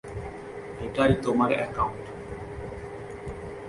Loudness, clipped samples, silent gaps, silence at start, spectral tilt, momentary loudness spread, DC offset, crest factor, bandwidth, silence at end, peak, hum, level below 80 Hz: -29 LUFS; under 0.1%; none; 0.05 s; -7 dB/octave; 15 LU; under 0.1%; 22 dB; 11.5 kHz; 0 s; -8 dBFS; none; -46 dBFS